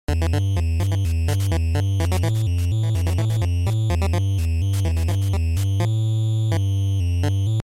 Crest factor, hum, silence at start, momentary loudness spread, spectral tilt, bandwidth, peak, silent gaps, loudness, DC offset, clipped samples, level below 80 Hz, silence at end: 12 dB; none; 0.1 s; 1 LU; -6.5 dB/octave; 15 kHz; -8 dBFS; none; -22 LUFS; under 0.1%; under 0.1%; -30 dBFS; 0.05 s